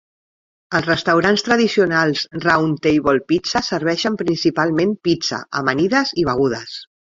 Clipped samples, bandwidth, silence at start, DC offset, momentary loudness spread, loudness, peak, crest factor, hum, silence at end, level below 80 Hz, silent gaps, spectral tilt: under 0.1%; 7.8 kHz; 0.7 s; under 0.1%; 6 LU; -18 LUFS; 0 dBFS; 18 dB; none; 0.35 s; -50 dBFS; none; -5 dB/octave